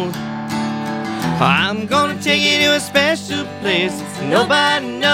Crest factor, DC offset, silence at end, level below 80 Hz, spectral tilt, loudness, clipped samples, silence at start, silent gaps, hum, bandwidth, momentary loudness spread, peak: 16 dB; under 0.1%; 0 s; -54 dBFS; -4 dB/octave; -16 LUFS; under 0.1%; 0 s; none; none; 16.5 kHz; 10 LU; 0 dBFS